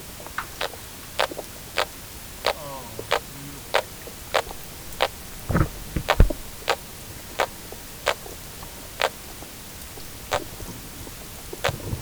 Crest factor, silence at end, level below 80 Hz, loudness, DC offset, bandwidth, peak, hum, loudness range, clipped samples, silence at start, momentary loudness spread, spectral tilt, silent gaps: 28 dB; 0 s; -34 dBFS; -29 LUFS; under 0.1%; over 20 kHz; 0 dBFS; none; 4 LU; under 0.1%; 0 s; 12 LU; -3.5 dB/octave; none